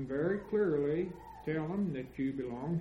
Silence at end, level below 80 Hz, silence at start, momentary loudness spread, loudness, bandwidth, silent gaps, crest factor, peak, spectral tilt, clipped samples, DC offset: 0 s; -60 dBFS; 0 s; 7 LU; -35 LUFS; 7.6 kHz; none; 12 dB; -22 dBFS; -9.5 dB/octave; under 0.1%; under 0.1%